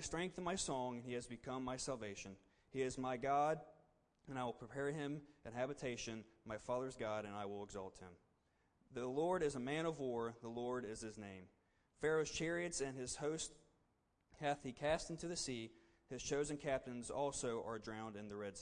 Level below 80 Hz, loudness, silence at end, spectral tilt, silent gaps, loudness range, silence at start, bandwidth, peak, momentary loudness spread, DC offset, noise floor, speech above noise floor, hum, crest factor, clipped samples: -68 dBFS; -44 LUFS; 0 s; -4 dB/octave; none; 3 LU; 0 s; 10.5 kHz; -28 dBFS; 12 LU; under 0.1%; -81 dBFS; 37 dB; none; 18 dB; under 0.1%